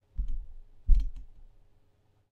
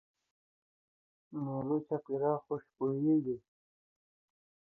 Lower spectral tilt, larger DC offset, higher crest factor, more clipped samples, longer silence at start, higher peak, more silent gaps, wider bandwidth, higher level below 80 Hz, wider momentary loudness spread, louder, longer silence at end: second, -8 dB/octave vs -13 dB/octave; neither; about the same, 22 dB vs 18 dB; neither; second, 0.2 s vs 1.3 s; first, -8 dBFS vs -18 dBFS; neither; second, 0.6 kHz vs 2.1 kHz; first, -30 dBFS vs -78 dBFS; first, 21 LU vs 11 LU; about the same, -35 LUFS vs -35 LUFS; second, 1.05 s vs 1.3 s